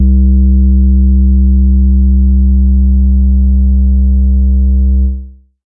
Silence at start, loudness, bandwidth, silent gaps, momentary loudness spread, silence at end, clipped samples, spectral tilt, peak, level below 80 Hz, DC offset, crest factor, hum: 0 s; -10 LUFS; 0.8 kHz; none; 2 LU; 0.35 s; under 0.1%; -19.5 dB/octave; -2 dBFS; -8 dBFS; under 0.1%; 6 dB; none